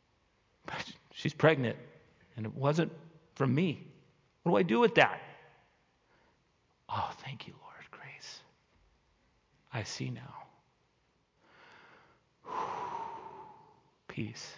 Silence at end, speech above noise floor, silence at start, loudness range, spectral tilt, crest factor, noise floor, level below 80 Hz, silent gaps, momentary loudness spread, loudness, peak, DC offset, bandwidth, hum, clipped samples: 0 s; 43 dB; 0.65 s; 15 LU; -6 dB/octave; 28 dB; -74 dBFS; -70 dBFS; none; 25 LU; -33 LUFS; -8 dBFS; under 0.1%; 7.6 kHz; none; under 0.1%